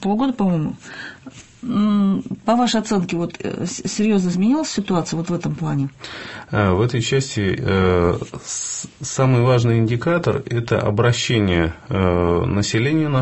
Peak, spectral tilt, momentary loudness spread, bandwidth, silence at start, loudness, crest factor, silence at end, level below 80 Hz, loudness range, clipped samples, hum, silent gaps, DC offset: -2 dBFS; -5.5 dB/octave; 10 LU; 8.4 kHz; 0 s; -19 LUFS; 18 dB; 0 s; -38 dBFS; 3 LU; under 0.1%; none; none; under 0.1%